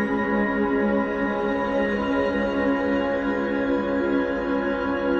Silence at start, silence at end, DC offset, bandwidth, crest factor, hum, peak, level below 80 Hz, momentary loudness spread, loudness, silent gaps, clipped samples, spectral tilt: 0 s; 0 s; under 0.1%; 7 kHz; 14 dB; none; -10 dBFS; -46 dBFS; 2 LU; -23 LUFS; none; under 0.1%; -7.5 dB/octave